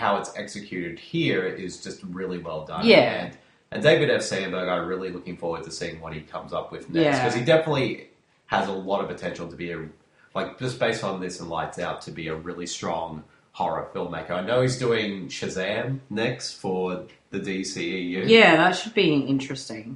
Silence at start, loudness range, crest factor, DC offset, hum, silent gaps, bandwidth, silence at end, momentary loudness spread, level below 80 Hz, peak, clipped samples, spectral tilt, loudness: 0 s; 9 LU; 24 dB; under 0.1%; none; none; 11.5 kHz; 0 s; 15 LU; -60 dBFS; 0 dBFS; under 0.1%; -5 dB/octave; -25 LUFS